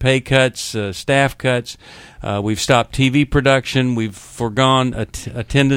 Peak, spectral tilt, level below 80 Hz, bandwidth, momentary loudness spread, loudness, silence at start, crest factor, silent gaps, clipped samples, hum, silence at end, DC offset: 0 dBFS; -5 dB/octave; -36 dBFS; 16 kHz; 12 LU; -17 LUFS; 0 s; 18 dB; none; under 0.1%; none; 0 s; under 0.1%